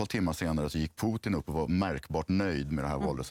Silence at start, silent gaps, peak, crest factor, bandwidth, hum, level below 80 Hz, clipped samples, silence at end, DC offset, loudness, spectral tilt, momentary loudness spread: 0 s; none; -18 dBFS; 14 dB; 16.5 kHz; none; -46 dBFS; under 0.1%; 0 s; under 0.1%; -32 LUFS; -6.5 dB/octave; 3 LU